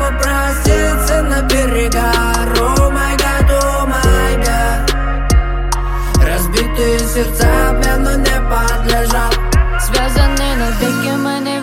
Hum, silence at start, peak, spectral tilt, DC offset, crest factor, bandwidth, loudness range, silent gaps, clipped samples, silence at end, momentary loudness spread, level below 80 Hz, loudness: none; 0 s; 0 dBFS; -4.5 dB/octave; under 0.1%; 12 dB; 16.5 kHz; 1 LU; none; under 0.1%; 0 s; 3 LU; -14 dBFS; -14 LUFS